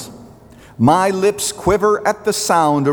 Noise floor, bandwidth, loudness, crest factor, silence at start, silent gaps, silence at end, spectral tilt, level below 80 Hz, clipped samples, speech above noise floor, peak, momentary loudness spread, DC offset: -42 dBFS; over 20 kHz; -16 LUFS; 14 dB; 0 s; none; 0 s; -4.5 dB/octave; -44 dBFS; under 0.1%; 27 dB; -2 dBFS; 5 LU; under 0.1%